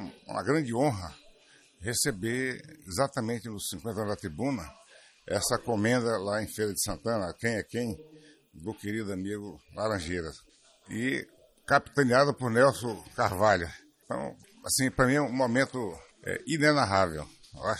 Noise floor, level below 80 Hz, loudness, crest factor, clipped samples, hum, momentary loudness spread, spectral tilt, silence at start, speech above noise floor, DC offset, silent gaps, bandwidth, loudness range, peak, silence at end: -60 dBFS; -56 dBFS; -29 LUFS; 22 dB; under 0.1%; none; 15 LU; -4.5 dB/octave; 0 s; 31 dB; under 0.1%; none; 15 kHz; 7 LU; -8 dBFS; 0 s